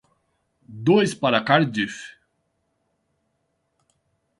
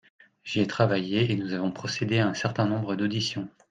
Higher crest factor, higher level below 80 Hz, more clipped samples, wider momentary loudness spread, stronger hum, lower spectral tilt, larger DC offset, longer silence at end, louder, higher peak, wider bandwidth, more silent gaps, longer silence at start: about the same, 24 dB vs 22 dB; about the same, -66 dBFS vs -64 dBFS; neither; first, 15 LU vs 6 LU; neither; about the same, -5.5 dB/octave vs -6 dB/octave; neither; first, 2.3 s vs 0.2 s; first, -21 LUFS vs -27 LUFS; first, -2 dBFS vs -6 dBFS; first, 11.5 kHz vs 9.4 kHz; neither; first, 0.7 s vs 0.45 s